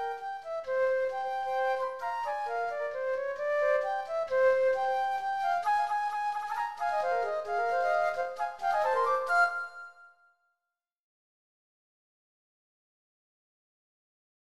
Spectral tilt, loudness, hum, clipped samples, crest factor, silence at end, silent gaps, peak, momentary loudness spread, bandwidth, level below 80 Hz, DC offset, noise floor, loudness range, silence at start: -1.5 dB/octave; -30 LUFS; none; under 0.1%; 16 dB; 4.5 s; none; -16 dBFS; 8 LU; 12.5 kHz; -70 dBFS; 0.1%; -88 dBFS; 3 LU; 0 s